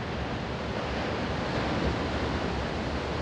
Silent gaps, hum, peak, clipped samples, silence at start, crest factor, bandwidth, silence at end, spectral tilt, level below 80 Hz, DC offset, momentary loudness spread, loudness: none; none; -16 dBFS; under 0.1%; 0 s; 14 dB; 10 kHz; 0 s; -6 dB/octave; -40 dBFS; under 0.1%; 4 LU; -31 LUFS